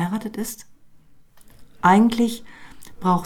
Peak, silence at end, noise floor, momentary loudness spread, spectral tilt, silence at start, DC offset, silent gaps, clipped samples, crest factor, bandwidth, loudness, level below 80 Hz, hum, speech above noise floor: -2 dBFS; 0 s; -49 dBFS; 18 LU; -6 dB/octave; 0 s; under 0.1%; none; under 0.1%; 20 dB; 17.5 kHz; -20 LUFS; -52 dBFS; none; 29 dB